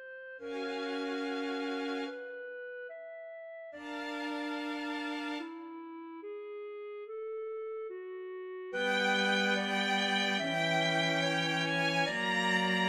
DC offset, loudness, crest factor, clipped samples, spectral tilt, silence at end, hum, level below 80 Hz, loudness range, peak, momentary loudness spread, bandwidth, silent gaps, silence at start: under 0.1%; -33 LUFS; 18 dB; under 0.1%; -4 dB/octave; 0 s; none; -76 dBFS; 11 LU; -18 dBFS; 16 LU; 15 kHz; none; 0 s